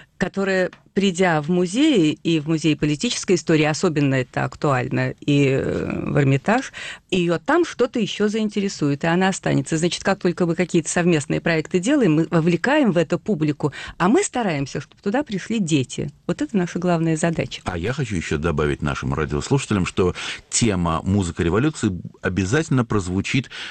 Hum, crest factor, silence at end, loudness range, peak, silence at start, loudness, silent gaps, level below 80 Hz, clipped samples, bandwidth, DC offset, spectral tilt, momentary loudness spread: none; 12 dB; 0 s; 3 LU; -8 dBFS; 0.2 s; -21 LUFS; none; -44 dBFS; under 0.1%; 9.4 kHz; under 0.1%; -5.5 dB/octave; 7 LU